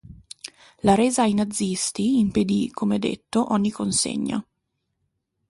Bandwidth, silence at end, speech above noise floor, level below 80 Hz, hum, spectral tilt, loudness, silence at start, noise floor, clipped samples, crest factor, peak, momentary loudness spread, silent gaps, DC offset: 11.5 kHz; 1.1 s; 55 dB; -52 dBFS; none; -4.5 dB/octave; -22 LUFS; 0.05 s; -77 dBFS; under 0.1%; 18 dB; -4 dBFS; 17 LU; none; under 0.1%